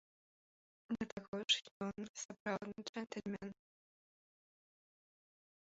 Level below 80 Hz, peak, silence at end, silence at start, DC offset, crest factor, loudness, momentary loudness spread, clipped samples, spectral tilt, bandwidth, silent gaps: -78 dBFS; -22 dBFS; 2.05 s; 0.9 s; under 0.1%; 26 dB; -42 LUFS; 12 LU; under 0.1%; -2 dB/octave; 7.6 kHz; 1.12-1.17 s, 1.28-1.33 s, 1.71-1.80 s, 2.09-2.14 s, 2.25-2.29 s, 2.40-2.46 s, 2.89-2.93 s